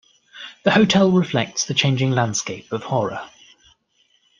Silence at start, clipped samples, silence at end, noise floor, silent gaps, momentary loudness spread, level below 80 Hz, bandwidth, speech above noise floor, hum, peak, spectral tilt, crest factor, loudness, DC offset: 0.35 s; under 0.1%; 1.15 s; -63 dBFS; none; 18 LU; -58 dBFS; 9.8 kHz; 44 dB; none; -2 dBFS; -4.5 dB/octave; 20 dB; -19 LUFS; under 0.1%